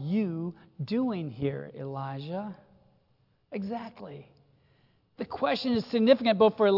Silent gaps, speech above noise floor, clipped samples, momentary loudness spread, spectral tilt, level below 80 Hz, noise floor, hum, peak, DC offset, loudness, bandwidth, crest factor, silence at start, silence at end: none; 41 dB; under 0.1%; 19 LU; -8 dB/octave; -68 dBFS; -69 dBFS; none; -8 dBFS; under 0.1%; -29 LUFS; 5.8 kHz; 22 dB; 0 s; 0 s